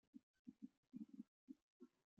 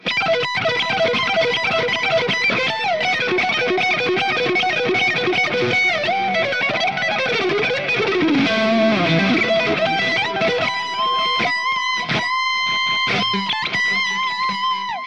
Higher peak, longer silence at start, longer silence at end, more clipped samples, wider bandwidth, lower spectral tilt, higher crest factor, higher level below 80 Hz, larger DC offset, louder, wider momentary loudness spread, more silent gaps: second, -44 dBFS vs -6 dBFS; about the same, 0.15 s vs 0.05 s; first, 0.3 s vs 0 s; neither; second, 7 kHz vs 10 kHz; first, -9 dB/octave vs -4 dB/octave; first, 20 dB vs 14 dB; second, under -90 dBFS vs -60 dBFS; second, under 0.1% vs 0.3%; second, -63 LUFS vs -18 LUFS; first, 8 LU vs 3 LU; first, 0.23-0.45 s, 0.77-0.83 s, 1.28-1.48 s, 1.62-1.80 s vs none